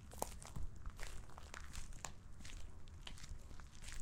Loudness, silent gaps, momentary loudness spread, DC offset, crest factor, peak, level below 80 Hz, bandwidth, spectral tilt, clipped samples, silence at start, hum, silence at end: -54 LUFS; none; 8 LU; under 0.1%; 28 dB; -20 dBFS; -52 dBFS; 16.5 kHz; -3.5 dB/octave; under 0.1%; 0 s; none; 0 s